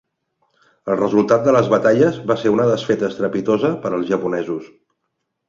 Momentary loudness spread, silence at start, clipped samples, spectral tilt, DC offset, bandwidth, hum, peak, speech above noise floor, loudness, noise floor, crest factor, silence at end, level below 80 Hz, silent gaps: 9 LU; 0.85 s; under 0.1%; -7 dB/octave; under 0.1%; 7.6 kHz; none; -2 dBFS; 58 dB; -17 LUFS; -75 dBFS; 16 dB; 0.85 s; -58 dBFS; none